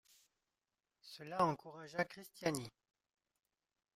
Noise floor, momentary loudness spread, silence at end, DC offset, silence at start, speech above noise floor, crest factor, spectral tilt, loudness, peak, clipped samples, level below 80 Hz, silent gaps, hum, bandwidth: under -90 dBFS; 17 LU; 1.25 s; under 0.1%; 1.05 s; over 49 dB; 24 dB; -5 dB/octave; -41 LUFS; -20 dBFS; under 0.1%; -80 dBFS; none; none; 16 kHz